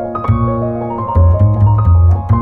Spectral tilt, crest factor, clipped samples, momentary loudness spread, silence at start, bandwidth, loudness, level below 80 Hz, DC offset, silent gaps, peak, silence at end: -12 dB/octave; 10 dB; under 0.1%; 8 LU; 0 s; 2.4 kHz; -12 LUFS; -20 dBFS; under 0.1%; none; -2 dBFS; 0 s